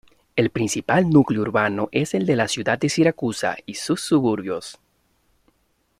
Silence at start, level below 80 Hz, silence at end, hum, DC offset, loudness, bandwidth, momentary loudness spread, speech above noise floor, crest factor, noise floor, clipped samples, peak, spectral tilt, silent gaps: 0.35 s; -56 dBFS; 1.25 s; none; under 0.1%; -21 LUFS; 14 kHz; 10 LU; 46 dB; 18 dB; -67 dBFS; under 0.1%; -4 dBFS; -5.5 dB/octave; none